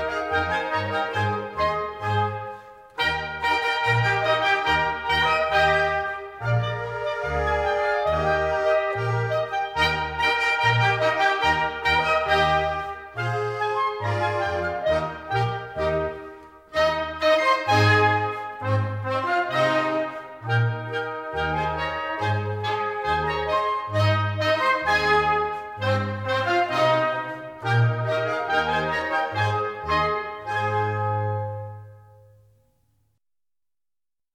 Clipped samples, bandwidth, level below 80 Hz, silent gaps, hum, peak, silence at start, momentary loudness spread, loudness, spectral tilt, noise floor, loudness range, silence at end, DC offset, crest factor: under 0.1%; 14 kHz; -46 dBFS; none; none; -6 dBFS; 0 s; 9 LU; -23 LUFS; -5.5 dB/octave; under -90 dBFS; 5 LU; 2.35 s; under 0.1%; 16 dB